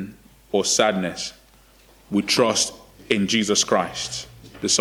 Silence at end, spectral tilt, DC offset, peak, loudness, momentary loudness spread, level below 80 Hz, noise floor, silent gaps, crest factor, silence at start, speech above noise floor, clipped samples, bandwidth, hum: 0 s; -2.5 dB/octave; under 0.1%; -2 dBFS; -21 LUFS; 13 LU; -56 dBFS; -53 dBFS; none; 20 dB; 0 s; 31 dB; under 0.1%; 19.5 kHz; none